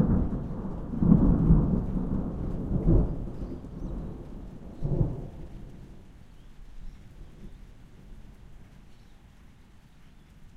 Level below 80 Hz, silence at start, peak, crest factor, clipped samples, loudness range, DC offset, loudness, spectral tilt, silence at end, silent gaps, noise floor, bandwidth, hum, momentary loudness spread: -34 dBFS; 0 s; -6 dBFS; 22 dB; under 0.1%; 25 LU; under 0.1%; -28 LUFS; -11 dB/octave; 0.1 s; none; -53 dBFS; 4.2 kHz; none; 28 LU